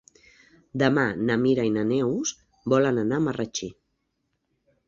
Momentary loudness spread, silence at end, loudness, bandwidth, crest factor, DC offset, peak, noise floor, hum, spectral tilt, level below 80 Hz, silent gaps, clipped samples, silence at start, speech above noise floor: 11 LU; 1.15 s; -24 LUFS; 7.6 kHz; 20 dB; under 0.1%; -6 dBFS; -76 dBFS; none; -5.5 dB/octave; -60 dBFS; none; under 0.1%; 0.75 s; 52 dB